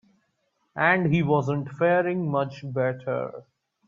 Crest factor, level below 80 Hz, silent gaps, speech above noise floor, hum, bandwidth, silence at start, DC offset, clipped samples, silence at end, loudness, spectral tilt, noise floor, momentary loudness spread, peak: 20 dB; -64 dBFS; none; 49 dB; none; 7.2 kHz; 0.75 s; under 0.1%; under 0.1%; 0.45 s; -24 LUFS; -8.5 dB/octave; -73 dBFS; 9 LU; -6 dBFS